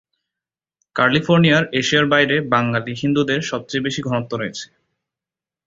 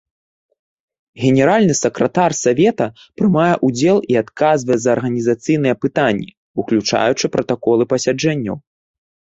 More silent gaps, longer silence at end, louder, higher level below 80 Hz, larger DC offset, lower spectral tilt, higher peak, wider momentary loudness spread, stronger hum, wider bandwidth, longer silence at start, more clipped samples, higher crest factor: second, none vs 6.37-6.54 s; first, 1 s vs 0.8 s; about the same, -18 LUFS vs -16 LUFS; about the same, -56 dBFS vs -54 dBFS; neither; about the same, -5 dB/octave vs -5.5 dB/octave; about the same, -2 dBFS vs -2 dBFS; first, 11 LU vs 7 LU; neither; about the same, 7.8 kHz vs 8 kHz; second, 0.95 s vs 1.15 s; neither; about the same, 18 dB vs 16 dB